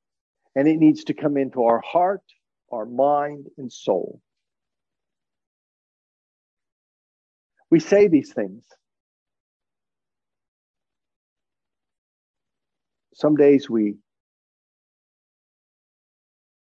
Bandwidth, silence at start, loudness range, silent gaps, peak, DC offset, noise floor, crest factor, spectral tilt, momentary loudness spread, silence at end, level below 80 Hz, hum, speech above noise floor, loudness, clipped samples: 7.4 kHz; 0.55 s; 11 LU; 5.47-6.57 s, 6.72-7.50 s, 9.00-9.26 s, 9.40-9.60 s, 10.48-10.74 s, 11.16-11.36 s, 11.98-12.34 s; -4 dBFS; under 0.1%; under -90 dBFS; 20 dB; -7.5 dB/octave; 16 LU; 2.65 s; -74 dBFS; none; over 70 dB; -20 LUFS; under 0.1%